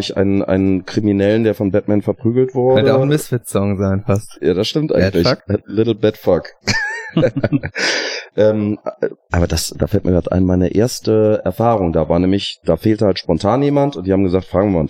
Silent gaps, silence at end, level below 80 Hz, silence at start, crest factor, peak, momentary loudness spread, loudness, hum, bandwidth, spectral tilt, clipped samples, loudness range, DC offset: none; 0 s; -42 dBFS; 0 s; 14 dB; -2 dBFS; 5 LU; -16 LUFS; none; 16.5 kHz; -6 dB/octave; under 0.1%; 2 LU; under 0.1%